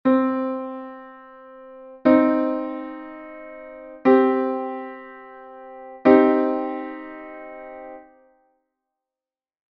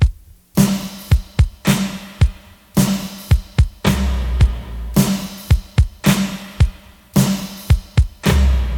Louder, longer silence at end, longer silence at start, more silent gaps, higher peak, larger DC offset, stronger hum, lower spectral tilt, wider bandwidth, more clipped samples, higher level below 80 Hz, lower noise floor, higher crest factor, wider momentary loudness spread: about the same, -20 LUFS vs -18 LUFS; first, 1.75 s vs 0 s; about the same, 0.05 s vs 0 s; neither; about the same, 0 dBFS vs 0 dBFS; neither; neither; about the same, -5 dB/octave vs -5.5 dB/octave; second, 5.2 kHz vs 19 kHz; neither; second, -64 dBFS vs -20 dBFS; first, under -90 dBFS vs -34 dBFS; first, 22 dB vs 16 dB; first, 25 LU vs 5 LU